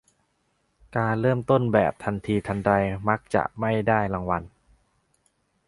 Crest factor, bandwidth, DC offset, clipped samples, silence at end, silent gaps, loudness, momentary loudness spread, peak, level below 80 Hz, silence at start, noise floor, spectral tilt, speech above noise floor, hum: 22 dB; 11.5 kHz; under 0.1%; under 0.1%; 1.2 s; none; -24 LUFS; 7 LU; -4 dBFS; -50 dBFS; 0.9 s; -71 dBFS; -8 dB/octave; 47 dB; none